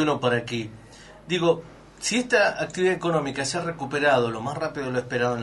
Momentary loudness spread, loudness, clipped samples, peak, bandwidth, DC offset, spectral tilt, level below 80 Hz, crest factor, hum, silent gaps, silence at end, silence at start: 8 LU; -24 LUFS; under 0.1%; -8 dBFS; 11.5 kHz; under 0.1%; -4.5 dB/octave; -56 dBFS; 18 dB; none; none; 0 s; 0 s